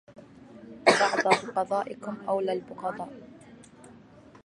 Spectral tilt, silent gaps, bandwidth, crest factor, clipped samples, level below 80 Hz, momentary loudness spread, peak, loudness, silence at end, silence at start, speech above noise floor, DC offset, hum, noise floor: -3.5 dB/octave; none; 11.5 kHz; 26 dB; under 0.1%; -70 dBFS; 18 LU; -2 dBFS; -27 LUFS; 0.5 s; 0.1 s; 24 dB; under 0.1%; none; -52 dBFS